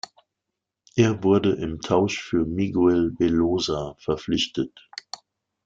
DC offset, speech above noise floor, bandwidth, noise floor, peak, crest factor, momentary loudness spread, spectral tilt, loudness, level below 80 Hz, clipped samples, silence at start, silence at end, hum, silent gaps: under 0.1%; 62 dB; 7.6 kHz; -84 dBFS; -6 dBFS; 18 dB; 17 LU; -6 dB/octave; -23 LUFS; -50 dBFS; under 0.1%; 0.95 s; 1 s; none; none